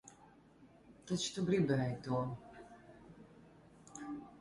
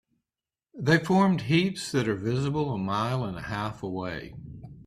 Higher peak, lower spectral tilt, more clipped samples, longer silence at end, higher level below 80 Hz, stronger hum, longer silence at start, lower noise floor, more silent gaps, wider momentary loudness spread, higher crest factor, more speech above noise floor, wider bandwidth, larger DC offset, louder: second, -20 dBFS vs -8 dBFS; about the same, -5.5 dB/octave vs -6 dB/octave; neither; about the same, 0 s vs 0.05 s; second, -68 dBFS vs -56 dBFS; neither; second, 0.05 s vs 0.75 s; second, -63 dBFS vs under -90 dBFS; neither; first, 25 LU vs 13 LU; about the same, 20 dB vs 20 dB; second, 27 dB vs over 64 dB; second, 11.5 kHz vs 13 kHz; neither; second, -38 LUFS vs -27 LUFS